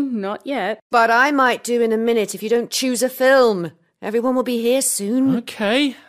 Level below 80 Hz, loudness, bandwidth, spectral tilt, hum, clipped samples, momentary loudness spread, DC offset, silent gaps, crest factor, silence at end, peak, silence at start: -68 dBFS; -18 LUFS; 15.5 kHz; -3 dB/octave; none; under 0.1%; 10 LU; under 0.1%; 0.82-0.90 s; 16 dB; 0.15 s; -2 dBFS; 0 s